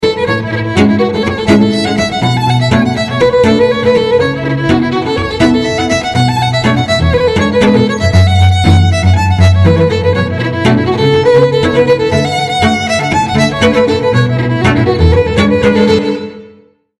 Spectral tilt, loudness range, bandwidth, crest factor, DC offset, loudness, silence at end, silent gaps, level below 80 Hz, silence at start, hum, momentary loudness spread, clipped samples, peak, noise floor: -6.5 dB/octave; 2 LU; 12 kHz; 10 dB; under 0.1%; -10 LUFS; 0.5 s; none; -28 dBFS; 0 s; none; 5 LU; under 0.1%; 0 dBFS; -43 dBFS